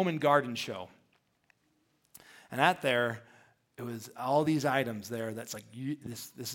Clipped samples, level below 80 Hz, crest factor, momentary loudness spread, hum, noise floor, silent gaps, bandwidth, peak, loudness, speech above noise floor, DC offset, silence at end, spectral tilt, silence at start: under 0.1%; -76 dBFS; 24 dB; 16 LU; none; -74 dBFS; none; 17 kHz; -8 dBFS; -32 LUFS; 42 dB; under 0.1%; 0 s; -5 dB/octave; 0 s